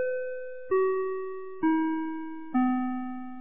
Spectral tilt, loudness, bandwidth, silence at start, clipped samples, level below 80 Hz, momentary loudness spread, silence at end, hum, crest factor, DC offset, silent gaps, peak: -5 dB/octave; -30 LUFS; 3.6 kHz; 0 s; under 0.1%; -68 dBFS; 12 LU; 0 s; none; 14 dB; 0.9%; none; -14 dBFS